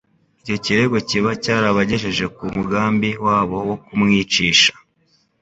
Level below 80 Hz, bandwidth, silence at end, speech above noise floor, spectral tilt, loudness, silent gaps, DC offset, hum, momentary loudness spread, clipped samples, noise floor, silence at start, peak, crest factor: -48 dBFS; 8 kHz; 0.7 s; 43 dB; -4 dB/octave; -17 LUFS; none; under 0.1%; none; 11 LU; under 0.1%; -61 dBFS; 0.45 s; 0 dBFS; 18 dB